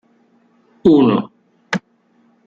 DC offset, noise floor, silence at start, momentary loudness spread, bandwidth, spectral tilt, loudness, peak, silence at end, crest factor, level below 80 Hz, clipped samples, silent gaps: under 0.1%; -57 dBFS; 0.85 s; 13 LU; 7.6 kHz; -7.5 dB/octave; -16 LUFS; -2 dBFS; 0.7 s; 16 dB; -54 dBFS; under 0.1%; none